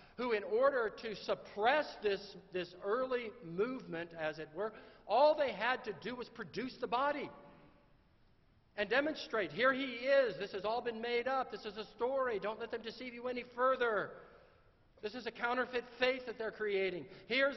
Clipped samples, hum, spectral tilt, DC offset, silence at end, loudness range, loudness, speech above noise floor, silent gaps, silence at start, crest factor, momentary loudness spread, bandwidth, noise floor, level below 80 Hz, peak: under 0.1%; none; -1.5 dB/octave; under 0.1%; 0 s; 4 LU; -37 LUFS; 32 dB; none; 0 s; 20 dB; 12 LU; 6.2 kHz; -68 dBFS; -70 dBFS; -18 dBFS